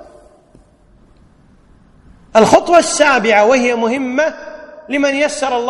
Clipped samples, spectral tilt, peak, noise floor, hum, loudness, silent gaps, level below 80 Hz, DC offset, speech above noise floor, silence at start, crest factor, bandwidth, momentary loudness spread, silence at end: 0.4%; -3.5 dB/octave; 0 dBFS; -48 dBFS; none; -12 LUFS; none; -48 dBFS; under 0.1%; 36 dB; 0 s; 16 dB; 12 kHz; 11 LU; 0 s